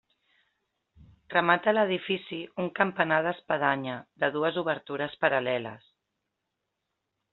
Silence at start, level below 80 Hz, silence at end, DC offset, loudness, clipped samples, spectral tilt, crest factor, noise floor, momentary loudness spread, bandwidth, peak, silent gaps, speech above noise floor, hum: 1 s; -72 dBFS; 1.55 s; under 0.1%; -28 LUFS; under 0.1%; -2.5 dB/octave; 24 dB; -83 dBFS; 10 LU; 4.3 kHz; -6 dBFS; none; 55 dB; none